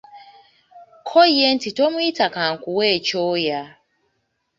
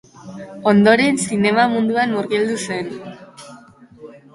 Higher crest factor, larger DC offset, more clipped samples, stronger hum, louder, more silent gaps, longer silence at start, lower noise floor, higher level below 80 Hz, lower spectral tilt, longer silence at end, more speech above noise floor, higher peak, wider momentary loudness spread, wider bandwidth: about the same, 18 dB vs 18 dB; neither; neither; neither; about the same, -18 LUFS vs -17 LUFS; neither; about the same, 0.15 s vs 0.25 s; first, -71 dBFS vs -44 dBFS; second, -66 dBFS vs -58 dBFS; about the same, -4 dB/octave vs -5 dB/octave; first, 0.9 s vs 0.15 s; first, 53 dB vs 26 dB; about the same, -2 dBFS vs 0 dBFS; second, 9 LU vs 23 LU; second, 7.6 kHz vs 11.5 kHz